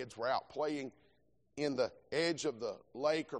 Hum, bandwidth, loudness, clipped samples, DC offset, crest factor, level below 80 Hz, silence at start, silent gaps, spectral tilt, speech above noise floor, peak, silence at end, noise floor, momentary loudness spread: none; 9.4 kHz; -37 LUFS; under 0.1%; under 0.1%; 18 dB; -76 dBFS; 0 s; none; -4 dB/octave; 37 dB; -20 dBFS; 0 s; -74 dBFS; 8 LU